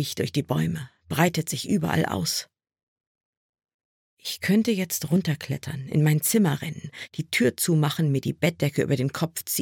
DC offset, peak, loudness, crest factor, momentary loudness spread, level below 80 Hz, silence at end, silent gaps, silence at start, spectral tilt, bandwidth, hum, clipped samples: under 0.1%; -6 dBFS; -25 LUFS; 20 dB; 10 LU; -62 dBFS; 0 s; 2.83-2.96 s, 3.07-3.53 s, 3.74-3.79 s, 3.85-4.17 s; 0 s; -5 dB/octave; 17.5 kHz; none; under 0.1%